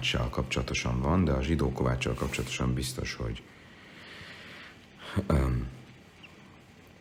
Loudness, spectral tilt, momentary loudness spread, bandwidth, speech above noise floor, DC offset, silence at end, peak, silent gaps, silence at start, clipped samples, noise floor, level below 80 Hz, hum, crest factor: -30 LUFS; -5.5 dB/octave; 23 LU; 16.5 kHz; 24 dB; under 0.1%; 0.1 s; -12 dBFS; none; 0 s; under 0.1%; -54 dBFS; -40 dBFS; none; 18 dB